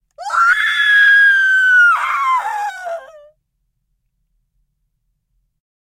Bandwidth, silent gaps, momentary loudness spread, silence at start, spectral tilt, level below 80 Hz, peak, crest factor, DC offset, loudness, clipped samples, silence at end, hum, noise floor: 16 kHz; none; 16 LU; 0.2 s; 2.5 dB/octave; -64 dBFS; -2 dBFS; 14 dB; under 0.1%; -11 LUFS; under 0.1%; 2.85 s; none; -69 dBFS